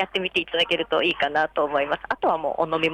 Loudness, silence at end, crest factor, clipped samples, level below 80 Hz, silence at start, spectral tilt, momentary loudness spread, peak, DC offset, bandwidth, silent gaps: -23 LUFS; 0 s; 14 dB; under 0.1%; -56 dBFS; 0 s; -4.5 dB/octave; 3 LU; -10 dBFS; under 0.1%; 11.5 kHz; none